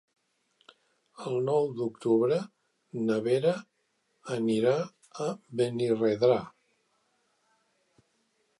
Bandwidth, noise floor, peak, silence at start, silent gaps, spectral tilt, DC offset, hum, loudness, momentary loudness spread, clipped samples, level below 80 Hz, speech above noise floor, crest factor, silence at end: 11.5 kHz; -75 dBFS; -12 dBFS; 1.2 s; none; -7 dB/octave; under 0.1%; none; -29 LUFS; 14 LU; under 0.1%; -76 dBFS; 48 dB; 18 dB; 2.1 s